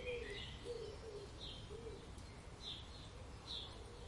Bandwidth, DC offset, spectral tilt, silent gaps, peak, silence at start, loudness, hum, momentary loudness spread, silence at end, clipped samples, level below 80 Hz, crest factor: 11.5 kHz; under 0.1%; -4 dB/octave; none; -34 dBFS; 0 s; -50 LUFS; none; 7 LU; 0 s; under 0.1%; -58 dBFS; 16 dB